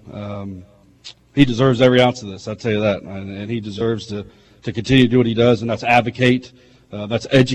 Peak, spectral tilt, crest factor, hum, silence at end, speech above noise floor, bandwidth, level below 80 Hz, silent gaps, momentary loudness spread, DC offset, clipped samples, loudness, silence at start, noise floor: -2 dBFS; -6.5 dB/octave; 16 dB; none; 0 s; 26 dB; 9.4 kHz; -46 dBFS; none; 17 LU; under 0.1%; under 0.1%; -17 LUFS; 0.05 s; -43 dBFS